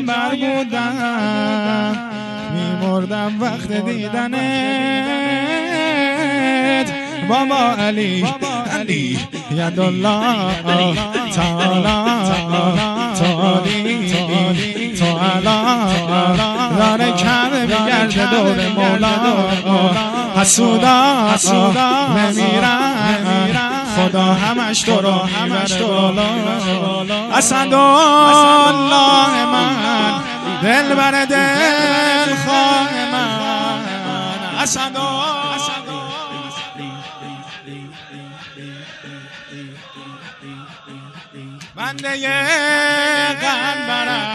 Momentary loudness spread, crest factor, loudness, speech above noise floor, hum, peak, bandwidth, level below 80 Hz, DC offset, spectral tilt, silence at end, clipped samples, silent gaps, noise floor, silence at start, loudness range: 17 LU; 16 dB; -15 LUFS; 22 dB; none; 0 dBFS; 12 kHz; -46 dBFS; under 0.1%; -4 dB/octave; 0 s; under 0.1%; none; -36 dBFS; 0 s; 13 LU